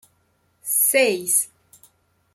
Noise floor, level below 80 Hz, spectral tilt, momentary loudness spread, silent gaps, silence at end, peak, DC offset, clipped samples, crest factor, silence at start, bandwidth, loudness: -65 dBFS; -76 dBFS; -0.5 dB/octave; 14 LU; none; 0.9 s; -4 dBFS; under 0.1%; under 0.1%; 20 dB; 0.65 s; 16.5 kHz; -18 LUFS